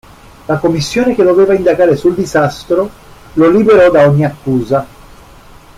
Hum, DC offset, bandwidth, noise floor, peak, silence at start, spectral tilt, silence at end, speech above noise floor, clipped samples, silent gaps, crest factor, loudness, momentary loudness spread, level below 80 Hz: none; under 0.1%; 15.5 kHz; -38 dBFS; 0 dBFS; 0.5 s; -7 dB/octave; 0.9 s; 28 dB; under 0.1%; none; 10 dB; -11 LUFS; 11 LU; -40 dBFS